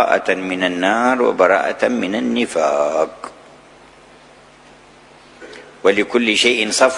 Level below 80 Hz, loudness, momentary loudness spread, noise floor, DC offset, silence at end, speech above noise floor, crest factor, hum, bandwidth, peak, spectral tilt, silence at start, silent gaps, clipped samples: -58 dBFS; -16 LUFS; 15 LU; -45 dBFS; under 0.1%; 0 s; 29 dB; 18 dB; none; 11 kHz; 0 dBFS; -3 dB/octave; 0 s; none; under 0.1%